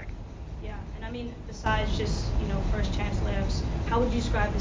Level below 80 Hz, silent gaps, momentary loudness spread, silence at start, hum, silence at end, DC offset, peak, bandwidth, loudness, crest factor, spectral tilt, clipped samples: -32 dBFS; none; 12 LU; 0 s; none; 0 s; under 0.1%; -14 dBFS; 7.6 kHz; -30 LUFS; 14 dB; -6 dB/octave; under 0.1%